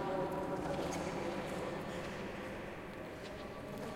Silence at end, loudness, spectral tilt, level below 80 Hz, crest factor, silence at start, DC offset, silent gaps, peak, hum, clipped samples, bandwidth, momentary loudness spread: 0 s; -42 LUFS; -5.5 dB/octave; -58 dBFS; 16 dB; 0 s; under 0.1%; none; -26 dBFS; none; under 0.1%; 16 kHz; 8 LU